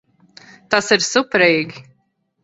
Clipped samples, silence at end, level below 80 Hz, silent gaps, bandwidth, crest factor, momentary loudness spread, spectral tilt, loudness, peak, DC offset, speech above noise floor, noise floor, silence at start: under 0.1%; 0.6 s; -62 dBFS; none; 8.2 kHz; 20 dB; 6 LU; -3 dB/octave; -16 LUFS; 0 dBFS; under 0.1%; 50 dB; -66 dBFS; 0.7 s